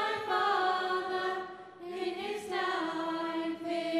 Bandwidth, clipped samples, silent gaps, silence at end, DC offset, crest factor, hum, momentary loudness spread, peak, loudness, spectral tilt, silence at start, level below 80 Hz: 14 kHz; under 0.1%; none; 0 s; under 0.1%; 16 dB; none; 9 LU; -18 dBFS; -33 LUFS; -3.5 dB/octave; 0 s; -78 dBFS